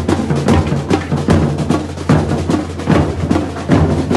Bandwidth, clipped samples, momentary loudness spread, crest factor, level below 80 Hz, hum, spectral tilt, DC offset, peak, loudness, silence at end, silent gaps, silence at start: 12 kHz; under 0.1%; 4 LU; 14 dB; -28 dBFS; none; -7 dB/octave; under 0.1%; 0 dBFS; -15 LUFS; 0 s; none; 0 s